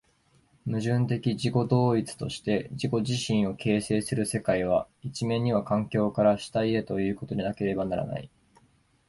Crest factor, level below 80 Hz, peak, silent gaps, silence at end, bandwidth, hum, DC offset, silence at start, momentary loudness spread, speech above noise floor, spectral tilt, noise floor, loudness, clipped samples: 18 dB; -56 dBFS; -10 dBFS; none; 0.8 s; 12 kHz; none; under 0.1%; 0.65 s; 8 LU; 38 dB; -6.5 dB/octave; -65 dBFS; -28 LUFS; under 0.1%